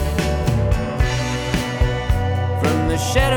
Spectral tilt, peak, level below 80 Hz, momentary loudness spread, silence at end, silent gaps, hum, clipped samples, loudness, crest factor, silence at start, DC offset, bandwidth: -5.5 dB/octave; -4 dBFS; -24 dBFS; 3 LU; 0 s; none; none; under 0.1%; -20 LUFS; 14 dB; 0 s; under 0.1%; 19.5 kHz